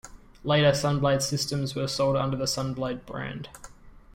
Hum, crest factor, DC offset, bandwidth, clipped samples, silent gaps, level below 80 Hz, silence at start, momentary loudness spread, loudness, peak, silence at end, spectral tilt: none; 18 dB; under 0.1%; 16.5 kHz; under 0.1%; none; -50 dBFS; 0.05 s; 14 LU; -26 LUFS; -8 dBFS; 0.15 s; -5 dB/octave